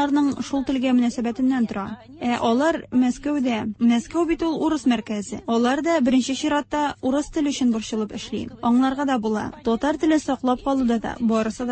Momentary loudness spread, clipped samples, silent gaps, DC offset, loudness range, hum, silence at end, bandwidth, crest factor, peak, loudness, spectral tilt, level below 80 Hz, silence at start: 6 LU; under 0.1%; none; under 0.1%; 1 LU; none; 0 s; 8.8 kHz; 14 dB; -8 dBFS; -22 LUFS; -5 dB/octave; -50 dBFS; 0 s